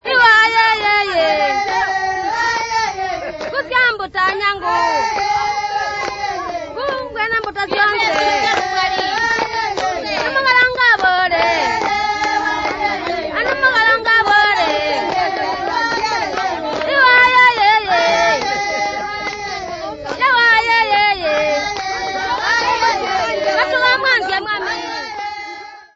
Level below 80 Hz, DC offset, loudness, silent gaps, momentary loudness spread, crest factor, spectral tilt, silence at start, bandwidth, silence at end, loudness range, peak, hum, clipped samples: -46 dBFS; under 0.1%; -15 LUFS; none; 12 LU; 16 dB; -2 dB/octave; 0.05 s; 8 kHz; 0.15 s; 4 LU; 0 dBFS; none; under 0.1%